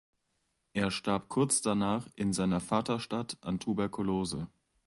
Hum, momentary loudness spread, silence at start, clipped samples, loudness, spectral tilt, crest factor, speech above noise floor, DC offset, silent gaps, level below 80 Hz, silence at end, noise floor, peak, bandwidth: none; 8 LU; 0.75 s; under 0.1%; -32 LUFS; -4.5 dB/octave; 20 dB; 47 dB; under 0.1%; none; -58 dBFS; 0.4 s; -79 dBFS; -14 dBFS; 11.5 kHz